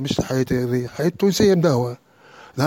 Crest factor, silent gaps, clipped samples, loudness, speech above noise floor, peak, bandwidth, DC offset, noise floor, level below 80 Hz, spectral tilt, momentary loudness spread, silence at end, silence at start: 16 dB; none; under 0.1%; -20 LUFS; 27 dB; -4 dBFS; 17 kHz; under 0.1%; -47 dBFS; -46 dBFS; -6 dB/octave; 12 LU; 0 s; 0 s